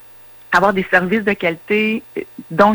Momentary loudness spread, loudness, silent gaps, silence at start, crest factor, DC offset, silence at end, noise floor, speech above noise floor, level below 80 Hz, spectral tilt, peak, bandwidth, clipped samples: 15 LU; -16 LUFS; none; 0.5 s; 16 dB; under 0.1%; 0 s; -40 dBFS; 24 dB; -52 dBFS; -6 dB/octave; -2 dBFS; over 20 kHz; under 0.1%